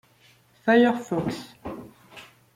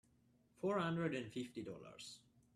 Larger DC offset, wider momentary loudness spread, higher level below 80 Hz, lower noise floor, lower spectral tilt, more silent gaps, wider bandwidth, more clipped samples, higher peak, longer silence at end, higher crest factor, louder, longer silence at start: neither; first, 27 LU vs 15 LU; first, -60 dBFS vs -78 dBFS; second, -59 dBFS vs -74 dBFS; about the same, -6 dB/octave vs -6 dB/octave; neither; first, 15 kHz vs 13 kHz; neither; first, -8 dBFS vs -26 dBFS; about the same, 0.35 s vs 0.4 s; about the same, 20 dB vs 18 dB; first, -23 LUFS vs -43 LUFS; about the same, 0.65 s vs 0.6 s